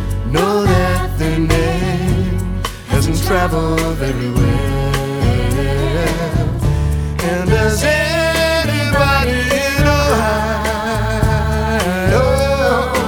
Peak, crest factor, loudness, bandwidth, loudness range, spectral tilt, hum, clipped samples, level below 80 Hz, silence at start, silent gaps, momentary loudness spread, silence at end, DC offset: 0 dBFS; 14 dB; -15 LUFS; 19 kHz; 3 LU; -5.5 dB/octave; none; under 0.1%; -22 dBFS; 0 s; none; 5 LU; 0 s; under 0.1%